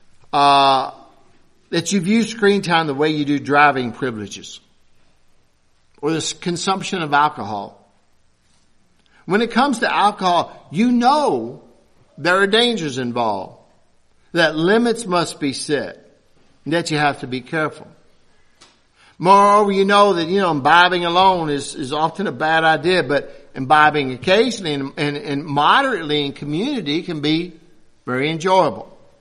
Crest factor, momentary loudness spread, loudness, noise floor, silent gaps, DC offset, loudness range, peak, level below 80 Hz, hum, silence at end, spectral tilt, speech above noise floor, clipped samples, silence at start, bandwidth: 18 dB; 12 LU; -17 LUFS; -57 dBFS; none; under 0.1%; 7 LU; 0 dBFS; -56 dBFS; none; 0.35 s; -4.5 dB/octave; 39 dB; under 0.1%; 0.35 s; 12.5 kHz